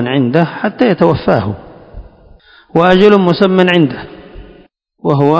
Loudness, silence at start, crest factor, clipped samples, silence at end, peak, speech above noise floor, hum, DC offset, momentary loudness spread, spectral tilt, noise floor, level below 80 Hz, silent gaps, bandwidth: -11 LUFS; 0 s; 12 dB; 0.9%; 0 s; 0 dBFS; 35 dB; none; under 0.1%; 14 LU; -8 dB/octave; -45 dBFS; -40 dBFS; none; 8 kHz